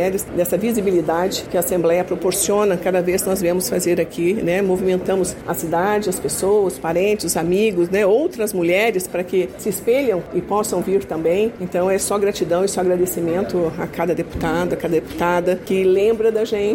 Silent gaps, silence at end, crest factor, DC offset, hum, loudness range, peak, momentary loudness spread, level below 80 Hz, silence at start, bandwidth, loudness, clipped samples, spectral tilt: none; 0 s; 12 dB; under 0.1%; none; 2 LU; -6 dBFS; 5 LU; -46 dBFS; 0 s; 17 kHz; -19 LUFS; under 0.1%; -4.5 dB/octave